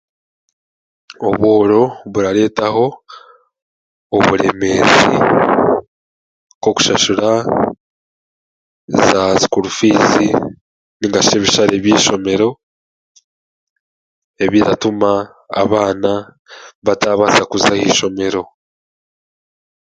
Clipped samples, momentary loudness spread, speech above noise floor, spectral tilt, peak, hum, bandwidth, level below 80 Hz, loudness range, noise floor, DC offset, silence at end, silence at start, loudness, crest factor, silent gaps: under 0.1%; 9 LU; over 77 dB; -4 dB/octave; 0 dBFS; none; 9.4 kHz; -48 dBFS; 4 LU; under -90 dBFS; under 0.1%; 1.4 s; 1.2 s; -13 LUFS; 16 dB; 3.62-4.10 s, 5.87-6.61 s, 7.80-8.88 s, 10.61-11.00 s, 12.63-13.15 s, 13.24-14.34 s, 16.39-16.45 s, 16.75-16.82 s